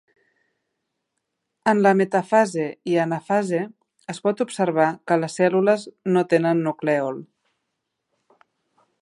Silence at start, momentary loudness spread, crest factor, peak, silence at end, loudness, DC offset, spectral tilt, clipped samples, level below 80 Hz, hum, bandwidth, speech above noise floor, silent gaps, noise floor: 1.65 s; 9 LU; 20 dB; -2 dBFS; 1.8 s; -21 LUFS; under 0.1%; -6.5 dB/octave; under 0.1%; -76 dBFS; none; 11.5 kHz; 58 dB; none; -78 dBFS